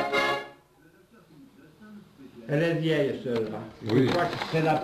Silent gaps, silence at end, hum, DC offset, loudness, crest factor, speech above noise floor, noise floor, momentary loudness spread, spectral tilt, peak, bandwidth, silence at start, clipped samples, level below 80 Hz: none; 0 s; none; under 0.1%; -27 LUFS; 18 dB; 32 dB; -58 dBFS; 13 LU; -6.5 dB/octave; -10 dBFS; 14 kHz; 0 s; under 0.1%; -62 dBFS